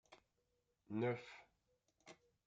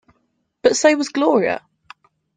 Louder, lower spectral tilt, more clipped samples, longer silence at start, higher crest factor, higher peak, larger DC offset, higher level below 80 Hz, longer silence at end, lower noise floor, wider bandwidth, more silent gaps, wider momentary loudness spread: second, -44 LUFS vs -18 LUFS; first, -7.5 dB/octave vs -3 dB/octave; neither; second, 0.1 s vs 0.65 s; about the same, 20 dB vs 18 dB; second, -30 dBFS vs -2 dBFS; neither; second, -88 dBFS vs -64 dBFS; second, 0.35 s vs 0.8 s; first, -85 dBFS vs -68 dBFS; about the same, 9 kHz vs 9.6 kHz; neither; first, 22 LU vs 8 LU